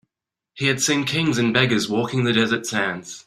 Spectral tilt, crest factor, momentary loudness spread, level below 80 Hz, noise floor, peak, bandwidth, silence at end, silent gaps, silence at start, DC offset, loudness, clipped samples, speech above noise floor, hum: -4 dB/octave; 20 dB; 5 LU; -58 dBFS; -85 dBFS; -2 dBFS; 15.5 kHz; 0.05 s; none; 0.55 s; under 0.1%; -20 LUFS; under 0.1%; 64 dB; none